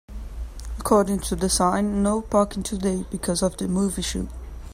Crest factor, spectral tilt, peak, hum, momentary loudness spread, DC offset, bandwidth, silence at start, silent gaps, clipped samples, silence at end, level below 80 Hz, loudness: 18 dB; -5 dB/octave; -6 dBFS; none; 16 LU; under 0.1%; 16 kHz; 0.1 s; none; under 0.1%; 0 s; -36 dBFS; -23 LUFS